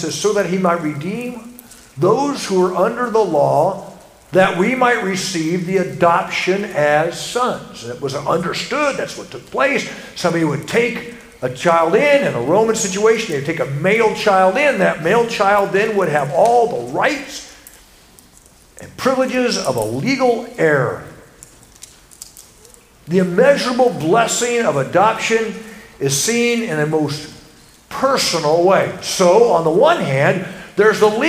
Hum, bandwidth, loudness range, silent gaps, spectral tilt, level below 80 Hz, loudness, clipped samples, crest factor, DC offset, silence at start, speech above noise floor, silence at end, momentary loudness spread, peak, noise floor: none; 16 kHz; 5 LU; none; -4.5 dB/octave; -52 dBFS; -16 LUFS; under 0.1%; 16 dB; under 0.1%; 0 s; 31 dB; 0 s; 13 LU; 0 dBFS; -47 dBFS